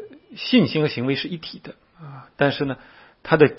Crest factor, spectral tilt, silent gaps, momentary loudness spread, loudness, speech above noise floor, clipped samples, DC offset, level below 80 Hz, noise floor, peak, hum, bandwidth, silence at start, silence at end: 22 dB; -10 dB/octave; none; 23 LU; -22 LUFS; 21 dB; under 0.1%; under 0.1%; -58 dBFS; -41 dBFS; 0 dBFS; none; 5.8 kHz; 0 s; 0.05 s